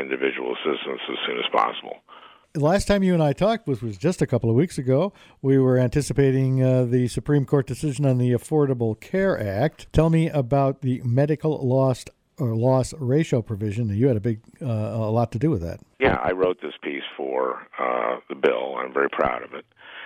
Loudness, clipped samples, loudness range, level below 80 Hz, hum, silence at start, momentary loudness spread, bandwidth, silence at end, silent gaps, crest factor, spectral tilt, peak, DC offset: -23 LUFS; under 0.1%; 4 LU; -46 dBFS; none; 0 s; 9 LU; 13.5 kHz; 0 s; none; 16 dB; -7 dB/octave; -6 dBFS; under 0.1%